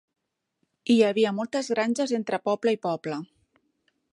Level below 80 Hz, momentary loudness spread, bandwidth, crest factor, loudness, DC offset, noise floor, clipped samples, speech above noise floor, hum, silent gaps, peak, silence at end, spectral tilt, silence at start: -76 dBFS; 11 LU; 11 kHz; 18 dB; -25 LUFS; under 0.1%; -77 dBFS; under 0.1%; 52 dB; none; none; -8 dBFS; 0.9 s; -5 dB/octave; 0.85 s